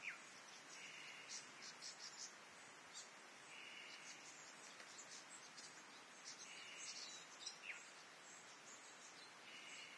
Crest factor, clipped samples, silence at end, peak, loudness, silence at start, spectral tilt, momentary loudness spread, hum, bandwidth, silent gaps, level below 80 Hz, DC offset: 20 dB; under 0.1%; 0 s; -38 dBFS; -55 LUFS; 0 s; 0.5 dB/octave; 6 LU; none; 11 kHz; none; under -90 dBFS; under 0.1%